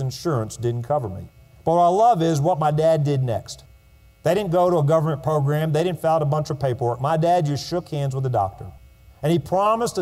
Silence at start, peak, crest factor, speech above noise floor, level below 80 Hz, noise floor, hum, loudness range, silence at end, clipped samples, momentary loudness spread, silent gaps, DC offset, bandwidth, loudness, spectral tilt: 0 s; -8 dBFS; 14 dB; 31 dB; -52 dBFS; -51 dBFS; none; 2 LU; 0 s; under 0.1%; 10 LU; none; under 0.1%; 15 kHz; -21 LUFS; -7 dB/octave